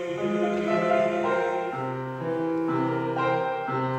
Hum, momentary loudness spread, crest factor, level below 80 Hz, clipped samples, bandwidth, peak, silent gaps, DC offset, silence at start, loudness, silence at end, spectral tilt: none; 7 LU; 14 dB; -66 dBFS; under 0.1%; 8.8 kHz; -12 dBFS; none; under 0.1%; 0 s; -26 LUFS; 0 s; -7 dB/octave